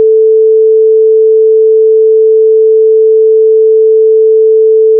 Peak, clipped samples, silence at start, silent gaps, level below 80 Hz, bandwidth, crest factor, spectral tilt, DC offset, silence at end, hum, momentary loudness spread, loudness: -2 dBFS; under 0.1%; 0 s; none; under -90 dBFS; 0.5 kHz; 4 dB; -11 dB/octave; under 0.1%; 0 s; none; 0 LU; -6 LUFS